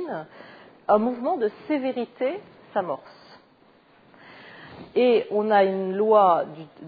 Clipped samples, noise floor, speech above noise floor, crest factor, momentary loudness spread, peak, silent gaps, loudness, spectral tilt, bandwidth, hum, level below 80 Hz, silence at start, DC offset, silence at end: under 0.1%; -57 dBFS; 34 dB; 18 dB; 19 LU; -6 dBFS; none; -23 LUFS; -9 dB/octave; 5 kHz; none; -70 dBFS; 0 s; under 0.1%; 0 s